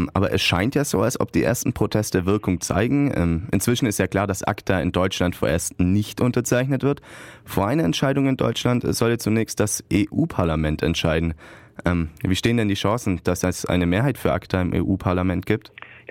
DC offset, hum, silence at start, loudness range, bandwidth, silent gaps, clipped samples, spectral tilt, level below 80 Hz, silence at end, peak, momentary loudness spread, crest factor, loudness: under 0.1%; none; 0 s; 1 LU; 16.5 kHz; none; under 0.1%; -5.5 dB/octave; -40 dBFS; 0.1 s; -6 dBFS; 4 LU; 16 dB; -22 LUFS